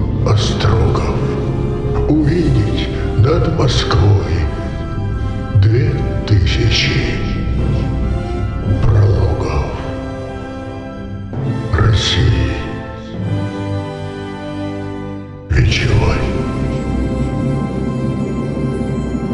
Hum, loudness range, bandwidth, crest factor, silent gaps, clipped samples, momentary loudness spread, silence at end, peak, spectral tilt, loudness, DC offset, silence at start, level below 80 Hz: none; 4 LU; 10 kHz; 12 dB; none; under 0.1%; 12 LU; 0 s; -2 dBFS; -6.5 dB/octave; -17 LUFS; under 0.1%; 0 s; -22 dBFS